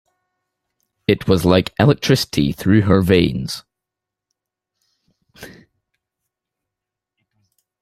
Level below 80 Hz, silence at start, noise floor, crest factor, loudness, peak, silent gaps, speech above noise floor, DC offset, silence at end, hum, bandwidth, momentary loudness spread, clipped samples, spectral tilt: -46 dBFS; 1.1 s; -84 dBFS; 18 dB; -16 LUFS; -2 dBFS; none; 69 dB; under 0.1%; 2.35 s; none; 15 kHz; 12 LU; under 0.1%; -6.5 dB/octave